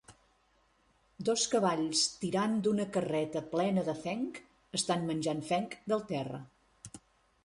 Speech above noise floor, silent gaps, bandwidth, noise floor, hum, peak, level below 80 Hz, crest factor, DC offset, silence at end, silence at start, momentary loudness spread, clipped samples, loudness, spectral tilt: 38 dB; none; 11.5 kHz; -70 dBFS; none; -16 dBFS; -70 dBFS; 18 dB; under 0.1%; 0.45 s; 0.1 s; 12 LU; under 0.1%; -33 LUFS; -4 dB/octave